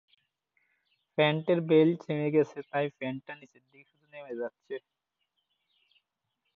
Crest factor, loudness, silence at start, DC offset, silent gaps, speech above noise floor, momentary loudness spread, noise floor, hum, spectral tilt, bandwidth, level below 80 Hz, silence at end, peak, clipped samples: 20 dB; -29 LUFS; 1.2 s; under 0.1%; none; 53 dB; 19 LU; -82 dBFS; none; -8 dB/octave; 6.6 kHz; -78 dBFS; 1.8 s; -12 dBFS; under 0.1%